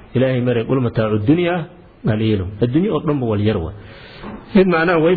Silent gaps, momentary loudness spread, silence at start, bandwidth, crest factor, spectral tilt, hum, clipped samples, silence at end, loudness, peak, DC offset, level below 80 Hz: none; 19 LU; 0.1 s; 4.9 kHz; 14 dB; -11 dB/octave; none; under 0.1%; 0 s; -17 LUFS; -4 dBFS; under 0.1%; -42 dBFS